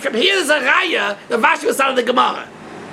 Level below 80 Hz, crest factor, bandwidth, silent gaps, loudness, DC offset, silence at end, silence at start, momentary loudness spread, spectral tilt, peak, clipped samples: -64 dBFS; 16 dB; 16 kHz; none; -15 LUFS; under 0.1%; 0 s; 0 s; 11 LU; -2 dB/octave; 0 dBFS; under 0.1%